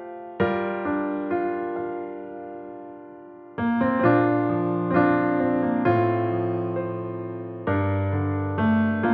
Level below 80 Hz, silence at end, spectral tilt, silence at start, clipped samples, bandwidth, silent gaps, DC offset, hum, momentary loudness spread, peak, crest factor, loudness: -58 dBFS; 0 s; -11.5 dB/octave; 0 s; under 0.1%; 4.9 kHz; none; under 0.1%; none; 17 LU; -8 dBFS; 16 dB; -24 LUFS